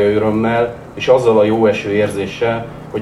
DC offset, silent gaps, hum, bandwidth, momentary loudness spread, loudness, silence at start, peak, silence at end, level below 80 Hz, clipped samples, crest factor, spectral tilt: under 0.1%; none; none; 12.5 kHz; 10 LU; -15 LUFS; 0 s; 0 dBFS; 0 s; -44 dBFS; under 0.1%; 14 dB; -6.5 dB/octave